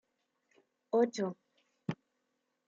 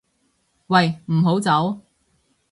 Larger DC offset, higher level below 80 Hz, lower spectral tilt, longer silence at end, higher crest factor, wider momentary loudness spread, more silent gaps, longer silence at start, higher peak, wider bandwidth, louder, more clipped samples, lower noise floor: neither; second, -86 dBFS vs -62 dBFS; about the same, -6 dB/octave vs -6.5 dB/octave; about the same, 0.75 s vs 0.75 s; about the same, 20 dB vs 20 dB; first, 17 LU vs 7 LU; neither; first, 0.95 s vs 0.7 s; second, -18 dBFS vs -2 dBFS; second, 7.6 kHz vs 11.5 kHz; second, -35 LUFS vs -19 LUFS; neither; first, -82 dBFS vs -67 dBFS